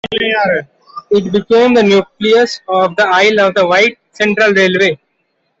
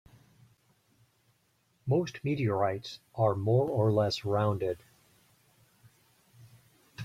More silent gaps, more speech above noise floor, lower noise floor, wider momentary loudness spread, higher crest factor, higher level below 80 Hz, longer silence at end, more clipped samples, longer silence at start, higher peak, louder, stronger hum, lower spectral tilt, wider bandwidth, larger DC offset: neither; first, 53 dB vs 43 dB; second, -64 dBFS vs -72 dBFS; second, 6 LU vs 15 LU; second, 10 dB vs 20 dB; first, -54 dBFS vs -66 dBFS; first, 0.65 s vs 0 s; neither; second, 0.05 s vs 1.85 s; first, -2 dBFS vs -14 dBFS; first, -11 LUFS vs -30 LUFS; neither; second, -4.5 dB/octave vs -7.5 dB/octave; second, 8 kHz vs 14.5 kHz; neither